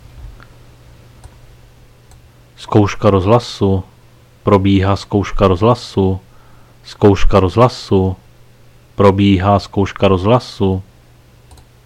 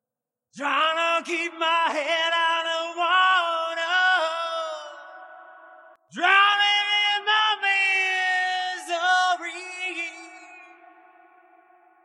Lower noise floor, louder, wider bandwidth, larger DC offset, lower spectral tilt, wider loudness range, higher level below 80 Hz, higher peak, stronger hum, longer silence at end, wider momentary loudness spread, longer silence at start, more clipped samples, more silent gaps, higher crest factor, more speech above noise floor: second, -45 dBFS vs -88 dBFS; first, -14 LUFS vs -22 LUFS; second, 10 kHz vs 12 kHz; neither; first, -7.5 dB/octave vs 0.5 dB/octave; second, 3 LU vs 6 LU; first, -28 dBFS vs under -90 dBFS; first, 0 dBFS vs -6 dBFS; neither; second, 1.05 s vs 1.4 s; second, 9 LU vs 14 LU; second, 0.15 s vs 0.55 s; neither; neither; second, 14 dB vs 20 dB; second, 33 dB vs 64 dB